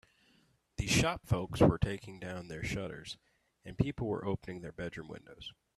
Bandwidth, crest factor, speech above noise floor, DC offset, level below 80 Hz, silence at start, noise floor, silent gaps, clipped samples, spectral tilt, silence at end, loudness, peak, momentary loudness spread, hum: 13.5 kHz; 24 dB; 35 dB; under 0.1%; -50 dBFS; 0.8 s; -70 dBFS; none; under 0.1%; -5.5 dB/octave; 0.25 s; -34 LUFS; -12 dBFS; 21 LU; none